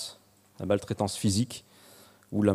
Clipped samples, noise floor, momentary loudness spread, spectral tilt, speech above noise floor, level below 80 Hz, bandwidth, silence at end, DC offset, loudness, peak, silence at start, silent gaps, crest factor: under 0.1%; -56 dBFS; 13 LU; -5.5 dB/octave; 27 dB; -64 dBFS; 15.5 kHz; 0 s; under 0.1%; -30 LUFS; -10 dBFS; 0 s; none; 20 dB